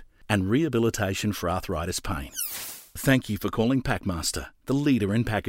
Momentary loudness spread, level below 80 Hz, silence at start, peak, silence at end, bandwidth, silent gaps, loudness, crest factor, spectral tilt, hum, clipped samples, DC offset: 7 LU; -44 dBFS; 0 s; -6 dBFS; 0 s; 16 kHz; none; -26 LUFS; 20 dB; -5 dB/octave; none; under 0.1%; under 0.1%